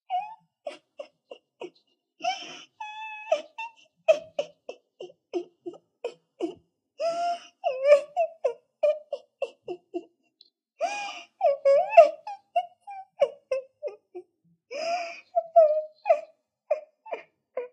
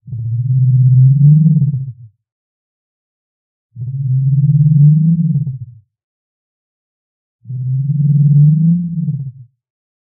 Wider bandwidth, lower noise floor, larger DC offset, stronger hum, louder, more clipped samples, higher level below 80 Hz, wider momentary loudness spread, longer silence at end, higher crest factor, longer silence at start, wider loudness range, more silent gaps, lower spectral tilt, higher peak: first, 9 kHz vs 0.5 kHz; first, -69 dBFS vs -31 dBFS; neither; neither; second, -27 LUFS vs -12 LUFS; neither; second, -86 dBFS vs -50 dBFS; first, 23 LU vs 16 LU; second, 0.05 s vs 0.65 s; first, 26 dB vs 12 dB; about the same, 0.1 s vs 0.05 s; first, 11 LU vs 5 LU; second, none vs 2.32-3.69 s, 6.04-7.39 s; second, -2.5 dB/octave vs -24.5 dB/octave; about the same, -2 dBFS vs 0 dBFS